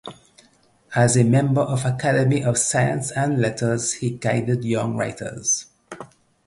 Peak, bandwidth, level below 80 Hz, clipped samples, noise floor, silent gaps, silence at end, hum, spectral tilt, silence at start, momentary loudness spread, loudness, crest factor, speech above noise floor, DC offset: -4 dBFS; 11.5 kHz; -56 dBFS; under 0.1%; -58 dBFS; none; 0.4 s; none; -5 dB/octave; 0.05 s; 10 LU; -21 LUFS; 18 dB; 37 dB; under 0.1%